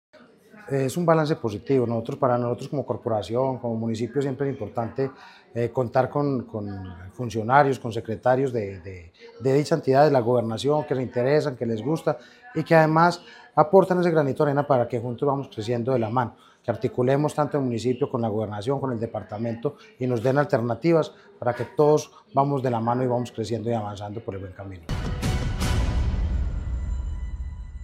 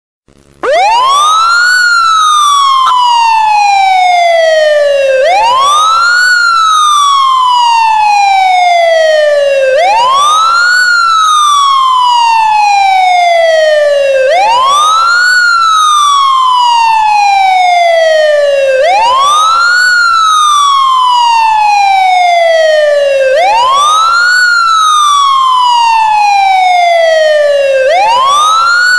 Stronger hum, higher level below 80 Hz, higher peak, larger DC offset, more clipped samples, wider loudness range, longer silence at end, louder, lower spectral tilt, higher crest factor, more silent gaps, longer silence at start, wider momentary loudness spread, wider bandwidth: neither; first, -38 dBFS vs -50 dBFS; about the same, -2 dBFS vs -4 dBFS; second, under 0.1% vs 0.6%; neither; first, 6 LU vs 1 LU; about the same, 0 s vs 0 s; second, -24 LUFS vs -6 LUFS; first, -7 dB/octave vs 1.5 dB/octave; first, 22 dB vs 4 dB; neither; about the same, 0.55 s vs 0.65 s; first, 14 LU vs 2 LU; about the same, 15.5 kHz vs 16.5 kHz